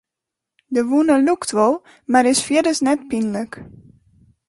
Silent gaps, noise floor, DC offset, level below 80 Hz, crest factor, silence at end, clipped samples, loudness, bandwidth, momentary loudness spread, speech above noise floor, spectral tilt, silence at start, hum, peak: none; -84 dBFS; under 0.1%; -58 dBFS; 16 dB; 0.8 s; under 0.1%; -18 LUFS; 11.5 kHz; 11 LU; 66 dB; -3.5 dB/octave; 0.7 s; none; -2 dBFS